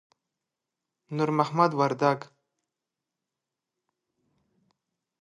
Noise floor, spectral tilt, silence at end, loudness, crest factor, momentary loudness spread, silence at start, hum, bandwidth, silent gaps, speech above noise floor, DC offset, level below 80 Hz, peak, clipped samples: -87 dBFS; -7 dB/octave; 2.95 s; -26 LUFS; 24 dB; 9 LU; 1.1 s; none; 10.5 kHz; none; 62 dB; under 0.1%; -78 dBFS; -6 dBFS; under 0.1%